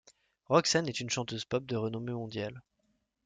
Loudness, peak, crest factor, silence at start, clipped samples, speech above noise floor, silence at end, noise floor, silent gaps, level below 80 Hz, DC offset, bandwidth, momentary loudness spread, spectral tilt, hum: -32 LUFS; -10 dBFS; 24 dB; 0.5 s; under 0.1%; 45 dB; 0.65 s; -77 dBFS; none; -68 dBFS; under 0.1%; 9.6 kHz; 12 LU; -4 dB/octave; none